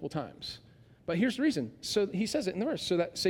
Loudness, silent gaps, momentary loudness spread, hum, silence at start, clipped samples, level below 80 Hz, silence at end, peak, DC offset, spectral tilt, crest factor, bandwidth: -32 LUFS; none; 13 LU; none; 0 s; under 0.1%; -64 dBFS; 0 s; -16 dBFS; under 0.1%; -5 dB/octave; 16 dB; 17 kHz